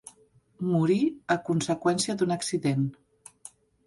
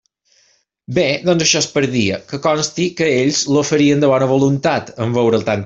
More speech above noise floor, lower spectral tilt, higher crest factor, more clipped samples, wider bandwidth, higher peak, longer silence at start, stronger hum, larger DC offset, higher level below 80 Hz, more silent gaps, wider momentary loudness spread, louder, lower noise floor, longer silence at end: second, 35 dB vs 43 dB; about the same, -5.5 dB/octave vs -4.5 dB/octave; about the same, 18 dB vs 16 dB; neither; first, 11.5 kHz vs 7.8 kHz; second, -12 dBFS vs 0 dBFS; second, 0.6 s vs 0.9 s; neither; neither; second, -66 dBFS vs -52 dBFS; neither; first, 22 LU vs 6 LU; second, -27 LUFS vs -15 LUFS; about the same, -61 dBFS vs -58 dBFS; first, 0.4 s vs 0 s